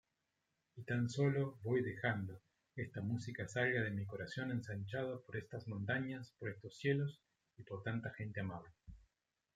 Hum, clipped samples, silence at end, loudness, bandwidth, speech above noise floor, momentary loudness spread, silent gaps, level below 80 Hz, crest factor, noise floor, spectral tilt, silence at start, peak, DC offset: none; under 0.1%; 0.55 s; -42 LUFS; 9.2 kHz; 46 dB; 13 LU; none; -72 dBFS; 20 dB; -87 dBFS; -7 dB/octave; 0.75 s; -22 dBFS; under 0.1%